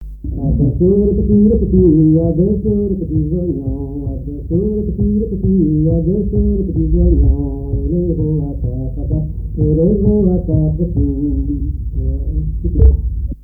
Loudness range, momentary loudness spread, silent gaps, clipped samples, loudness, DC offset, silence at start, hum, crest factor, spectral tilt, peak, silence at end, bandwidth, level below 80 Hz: 4 LU; 10 LU; none; under 0.1%; -15 LUFS; under 0.1%; 0 s; none; 14 dB; -15.5 dB/octave; 0 dBFS; 0 s; 1.1 kHz; -20 dBFS